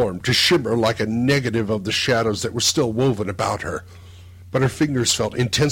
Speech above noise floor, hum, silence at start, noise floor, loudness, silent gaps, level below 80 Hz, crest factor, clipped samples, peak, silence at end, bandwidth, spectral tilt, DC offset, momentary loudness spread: 21 dB; none; 0 s; -41 dBFS; -20 LUFS; none; -48 dBFS; 14 dB; under 0.1%; -6 dBFS; 0 s; 16.5 kHz; -4 dB/octave; under 0.1%; 7 LU